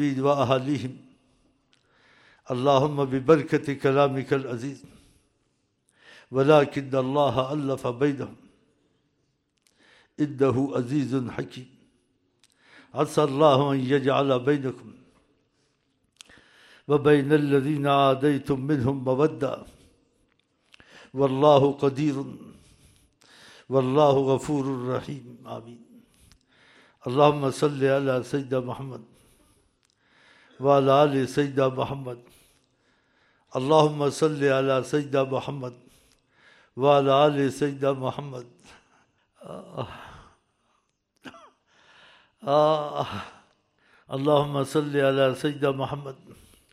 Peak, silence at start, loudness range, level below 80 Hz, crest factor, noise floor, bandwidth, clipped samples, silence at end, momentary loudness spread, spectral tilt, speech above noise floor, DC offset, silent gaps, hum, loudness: -4 dBFS; 0 s; 5 LU; -62 dBFS; 22 dB; -72 dBFS; 13 kHz; under 0.1%; 0.4 s; 18 LU; -7 dB/octave; 49 dB; under 0.1%; none; none; -24 LUFS